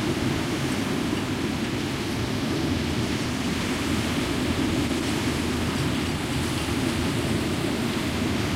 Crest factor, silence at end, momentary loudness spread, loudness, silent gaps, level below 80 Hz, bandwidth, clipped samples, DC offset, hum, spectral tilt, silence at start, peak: 16 dB; 0 s; 2 LU; -26 LUFS; none; -40 dBFS; 16 kHz; under 0.1%; under 0.1%; none; -5 dB/octave; 0 s; -10 dBFS